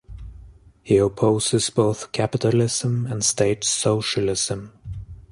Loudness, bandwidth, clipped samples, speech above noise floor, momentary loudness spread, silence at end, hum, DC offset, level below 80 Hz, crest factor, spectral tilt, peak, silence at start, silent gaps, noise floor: -21 LUFS; 11.5 kHz; under 0.1%; 25 dB; 17 LU; 0.1 s; none; under 0.1%; -46 dBFS; 18 dB; -4.5 dB/octave; -4 dBFS; 0.1 s; none; -46 dBFS